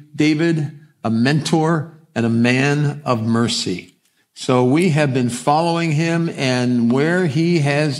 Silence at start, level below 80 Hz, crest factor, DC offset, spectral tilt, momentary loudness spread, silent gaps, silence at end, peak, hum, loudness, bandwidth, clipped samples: 0 s; -64 dBFS; 16 dB; under 0.1%; -6 dB/octave; 7 LU; none; 0 s; 0 dBFS; none; -18 LUFS; 12.5 kHz; under 0.1%